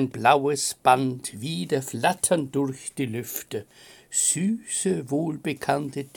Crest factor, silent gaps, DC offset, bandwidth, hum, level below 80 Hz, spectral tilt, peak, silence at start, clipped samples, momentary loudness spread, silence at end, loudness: 20 dB; none; under 0.1%; 17 kHz; none; -66 dBFS; -4 dB/octave; -4 dBFS; 0 s; under 0.1%; 11 LU; 0.1 s; -25 LUFS